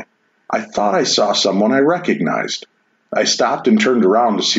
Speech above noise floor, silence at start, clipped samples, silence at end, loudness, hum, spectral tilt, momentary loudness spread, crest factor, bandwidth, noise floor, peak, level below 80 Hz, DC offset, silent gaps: 25 dB; 0 s; under 0.1%; 0 s; -15 LUFS; none; -3.5 dB/octave; 10 LU; 12 dB; 8 kHz; -40 dBFS; -4 dBFS; -64 dBFS; under 0.1%; none